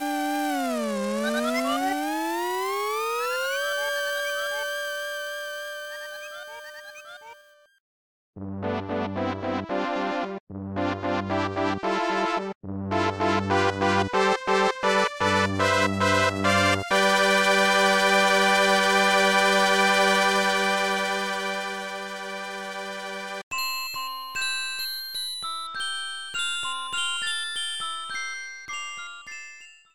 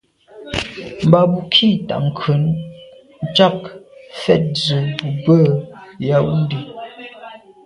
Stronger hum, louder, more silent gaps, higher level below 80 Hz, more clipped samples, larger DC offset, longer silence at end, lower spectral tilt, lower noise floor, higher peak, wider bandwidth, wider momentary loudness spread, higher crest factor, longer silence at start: neither; second, -24 LUFS vs -16 LUFS; first, 7.80-8.33 s, 10.40-10.47 s, 12.55-12.61 s, 23.43-23.51 s vs none; second, -64 dBFS vs -48 dBFS; neither; first, 0.1% vs under 0.1%; about the same, 0.2 s vs 0.3 s; second, -3 dB/octave vs -7 dB/octave; first, -53 dBFS vs -41 dBFS; second, -6 dBFS vs 0 dBFS; first, 19.5 kHz vs 11 kHz; second, 15 LU vs 21 LU; about the same, 20 dB vs 18 dB; second, 0 s vs 0.35 s